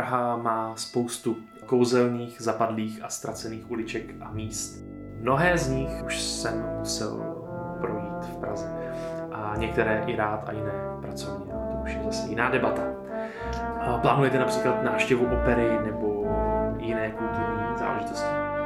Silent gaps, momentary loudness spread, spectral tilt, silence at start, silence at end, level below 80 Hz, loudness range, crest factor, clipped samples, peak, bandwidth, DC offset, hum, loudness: none; 11 LU; -5 dB/octave; 0 s; 0 s; -42 dBFS; 6 LU; 20 dB; under 0.1%; -6 dBFS; 16 kHz; under 0.1%; none; -28 LUFS